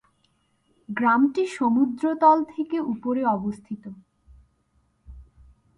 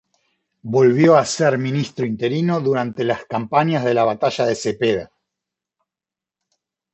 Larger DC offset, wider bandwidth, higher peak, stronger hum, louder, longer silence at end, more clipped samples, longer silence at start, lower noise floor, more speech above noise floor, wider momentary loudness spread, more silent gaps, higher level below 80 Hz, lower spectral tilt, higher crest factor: neither; first, 10.5 kHz vs 8.4 kHz; second, -6 dBFS vs -2 dBFS; neither; second, -23 LUFS vs -18 LUFS; second, 0.55 s vs 1.9 s; neither; first, 0.9 s vs 0.65 s; second, -68 dBFS vs -89 dBFS; second, 45 dB vs 71 dB; first, 17 LU vs 9 LU; neither; about the same, -56 dBFS vs -60 dBFS; about the same, -7 dB/octave vs -6 dB/octave; about the same, 20 dB vs 18 dB